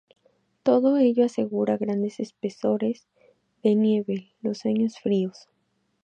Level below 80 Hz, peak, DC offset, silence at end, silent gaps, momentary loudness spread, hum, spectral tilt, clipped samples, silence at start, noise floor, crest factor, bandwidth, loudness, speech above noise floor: -76 dBFS; -8 dBFS; under 0.1%; 0.75 s; none; 11 LU; none; -8 dB/octave; under 0.1%; 0.65 s; -72 dBFS; 18 dB; 8.8 kHz; -25 LUFS; 49 dB